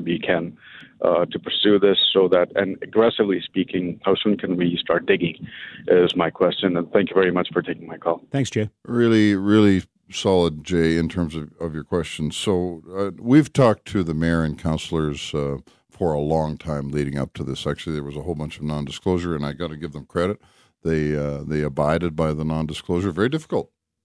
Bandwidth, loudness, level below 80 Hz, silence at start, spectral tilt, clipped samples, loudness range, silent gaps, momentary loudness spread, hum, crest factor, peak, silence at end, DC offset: 11 kHz; -22 LUFS; -44 dBFS; 0 s; -6 dB/octave; under 0.1%; 7 LU; none; 12 LU; none; 18 dB; -4 dBFS; 0.4 s; under 0.1%